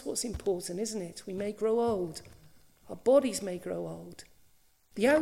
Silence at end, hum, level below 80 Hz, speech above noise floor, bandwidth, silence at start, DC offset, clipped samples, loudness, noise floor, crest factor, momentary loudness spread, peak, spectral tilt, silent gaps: 0 s; none; -58 dBFS; 33 dB; 16 kHz; 0 s; under 0.1%; under 0.1%; -31 LUFS; -63 dBFS; 20 dB; 20 LU; -12 dBFS; -4.5 dB/octave; none